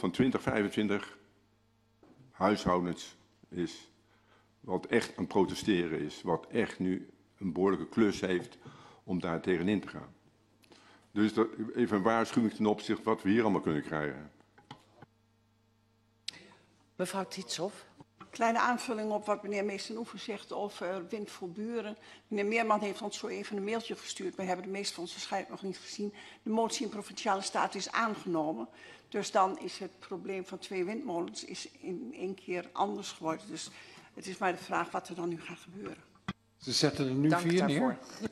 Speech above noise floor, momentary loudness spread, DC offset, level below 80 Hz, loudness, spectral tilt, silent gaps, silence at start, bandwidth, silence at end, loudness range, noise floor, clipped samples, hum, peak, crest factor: 37 dB; 15 LU; under 0.1%; -68 dBFS; -34 LUFS; -5 dB/octave; none; 0 s; 13 kHz; 0 s; 6 LU; -70 dBFS; under 0.1%; none; -12 dBFS; 22 dB